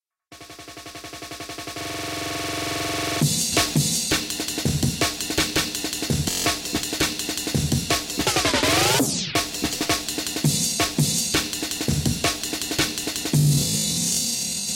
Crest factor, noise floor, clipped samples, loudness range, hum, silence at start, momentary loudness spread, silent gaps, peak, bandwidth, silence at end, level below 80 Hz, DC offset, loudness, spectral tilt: 16 dB; -47 dBFS; under 0.1%; 2 LU; none; 0.3 s; 11 LU; none; -8 dBFS; 16.5 kHz; 0 s; -44 dBFS; under 0.1%; -22 LUFS; -3 dB/octave